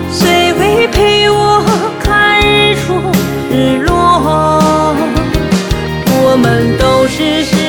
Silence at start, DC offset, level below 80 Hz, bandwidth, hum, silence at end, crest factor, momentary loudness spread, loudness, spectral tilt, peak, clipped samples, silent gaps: 0 s; under 0.1%; -24 dBFS; over 20 kHz; none; 0 s; 10 dB; 5 LU; -10 LUFS; -5 dB/octave; 0 dBFS; under 0.1%; none